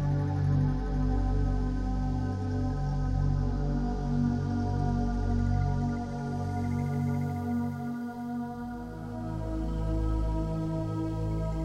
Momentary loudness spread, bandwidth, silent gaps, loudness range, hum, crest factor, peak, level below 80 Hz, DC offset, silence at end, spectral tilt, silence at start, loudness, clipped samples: 7 LU; 8.8 kHz; none; 4 LU; none; 12 dB; -16 dBFS; -34 dBFS; under 0.1%; 0 s; -9 dB/octave; 0 s; -31 LUFS; under 0.1%